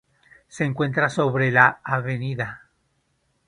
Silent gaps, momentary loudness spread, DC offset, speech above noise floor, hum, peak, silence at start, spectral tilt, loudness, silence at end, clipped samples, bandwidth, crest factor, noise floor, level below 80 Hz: none; 12 LU; under 0.1%; 48 dB; none; 0 dBFS; 0.55 s; -6.5 dB/octave; -21 LUFS; 0.9 s; under 0.1%; 10.5 kHz; 24 dB; -69 dBFS; -60 dBFS